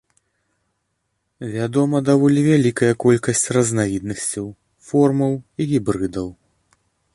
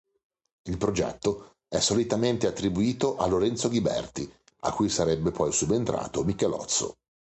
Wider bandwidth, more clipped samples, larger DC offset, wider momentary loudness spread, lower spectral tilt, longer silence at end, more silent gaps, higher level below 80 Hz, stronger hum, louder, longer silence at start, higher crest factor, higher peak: first, 11.5 kHz vs 9.2 kHz; neither; neither; first, 14 LU vs 10 LU; first, -6 dB/octave vs -4.5 dB/octave; first, 0.8 s vs 0.45 s; neither; about the same, -52 dBFS vs -50 dBFS; neither; first, -19 LUFS vs -27 LUFS; first, 1.4 s vs 0.65 s; about the same, 16 dB vs 16 dB; first, -2 dBFS vs -12 dBFS